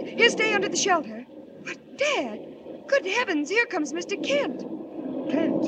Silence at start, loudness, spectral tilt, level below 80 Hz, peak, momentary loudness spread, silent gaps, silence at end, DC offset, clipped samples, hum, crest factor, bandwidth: 0 s; -25 LUFS; -2.5 dB/octave; -76 dBFS; -6 dBFS; 17 LU; none; 0 s; under 0.1%; under 0.1%; none; 20 dB; 9.4 kHz